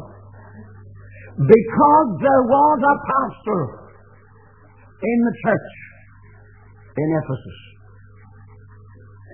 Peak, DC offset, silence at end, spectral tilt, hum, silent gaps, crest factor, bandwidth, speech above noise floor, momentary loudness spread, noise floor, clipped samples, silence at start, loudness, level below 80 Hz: 0 dBFS; 0.2%; 1.8 s; -11.5 dB/octave; none; none; 20 dB; 5.4 kHz; 32 dB; 18 LU; -49 dBFS; under 0.1%; 0 s; -18 LUFS; -52 dBFS